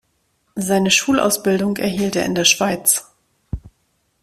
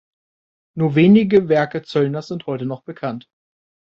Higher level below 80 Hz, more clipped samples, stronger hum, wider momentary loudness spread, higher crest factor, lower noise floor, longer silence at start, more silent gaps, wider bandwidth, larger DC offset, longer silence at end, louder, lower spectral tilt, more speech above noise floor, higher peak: first, -44 dBFS vs -58 dBFS; neither; neither; first, 19 LU vs 16 LU; about the same, 18 dB vs 16 dB; second, -66 dBFS vs under -90 dBFS; second, 0.55 s vs 0.75 s; neither; first, 16 kHz vs 6.8 kHz; neither; second, 0.55 s vs 0.75 s; about the same, -17 LUFS vs -18 LUFS; second, -3 dB/octave vs -8.5 dB/octave; second, 48 dB vs over 73 dB; about the same, 0 dBFS vs -2 dBFS